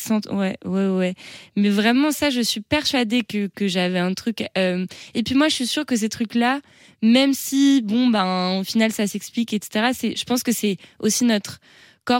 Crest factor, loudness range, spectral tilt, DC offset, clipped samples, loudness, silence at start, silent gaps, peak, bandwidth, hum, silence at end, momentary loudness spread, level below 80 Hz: 16 dB; 3 LU; -4 dB/octave; under 0.1%; under 0.1%; -21 LUFS; 0 s; none; -6 dBFS; 17 kHz; none; 0 s; 8 LU; -60 dBFS